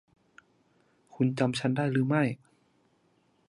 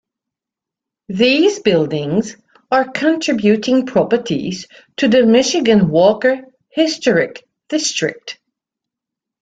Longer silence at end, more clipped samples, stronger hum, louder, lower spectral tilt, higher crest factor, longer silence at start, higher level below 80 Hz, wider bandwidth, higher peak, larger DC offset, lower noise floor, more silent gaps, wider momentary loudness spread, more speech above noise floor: about the same, 1.15 s vs 1.1 s; neither; neither; second, -28 LUFS vs -15 LUFS; first, -7 dB/octave vs -4.5 dB/octave; about the same, 20 dB vs 16 dB; about the same, 1.15 s vs 1.1 s; second, -72 dBFS vs -56 dBFS; first, 11.5 kHz vs 9.2 kHz; second, -12 dBFS vs 0 dBFS; neither; second, -69 dBFS vs -86 dBFS; neither; second, 5 LU vs 14 LU; second, 42 dB vs 71 dB